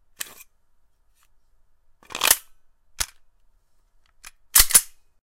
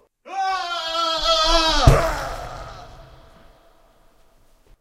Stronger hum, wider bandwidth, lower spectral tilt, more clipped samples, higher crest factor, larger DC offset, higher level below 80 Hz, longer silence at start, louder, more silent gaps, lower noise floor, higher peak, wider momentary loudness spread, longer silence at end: neither; about the same, 16.5 kHz vs 15.5 kHz; second, 1.5 dB/octave vs -4 dB/octave; neither; about the same, 26 dB vs 22 dB; neither; second, -42 dBFS vs -30 dBFS; first, 2.15 s vs 0.25 s; about the same, -18 LUFS vs -19 LUFS; neither; first, -59 dBFS vs -54 dBFS; about the same, 0 dBFS vs 0 dBFS; about the same, 22 LU vs 20 LU; second, 0.35 s vs 1.75 s